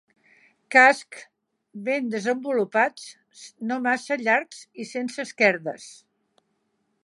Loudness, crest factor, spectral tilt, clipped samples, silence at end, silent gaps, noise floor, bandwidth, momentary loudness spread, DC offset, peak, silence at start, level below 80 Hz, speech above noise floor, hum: -22 LUFS; 22 dB; -4 dB/octave; under 0.1%; 1.1 s; none; -73 dBFS; 11.5 kHz; 24 LU; under 0.1%; -2 dBFS; 0.7 s; -84 dBFS; 49 dB; none